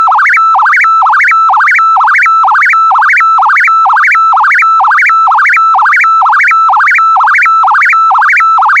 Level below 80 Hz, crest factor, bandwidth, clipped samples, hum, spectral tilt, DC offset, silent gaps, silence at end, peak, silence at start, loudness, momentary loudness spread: -74 dBFS; 6 dB; 12 kHz; under 0.1%; none; 3 dB/octave; under 0.1%; none; 0 s; 0 dBFS; 0 s; -4 LUFS; 0 LU